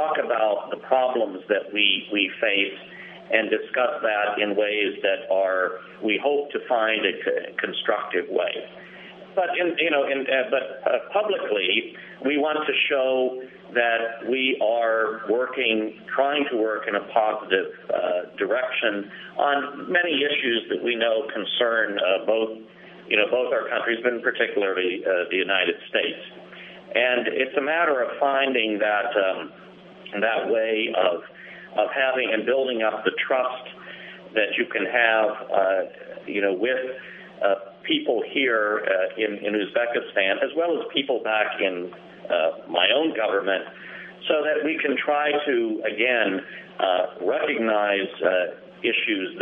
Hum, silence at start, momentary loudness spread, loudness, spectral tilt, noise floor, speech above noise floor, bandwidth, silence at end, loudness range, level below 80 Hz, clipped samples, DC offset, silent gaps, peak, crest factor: none; 0 s; 9 LU; -23 LUFS; -7 dB/octave; -44 dBFS; 21 dB; 4 kHz; 0 s; 2 LU; -74 dBFS; under 0.1%; under 0.1%; none; -2 dBFS; 22 dB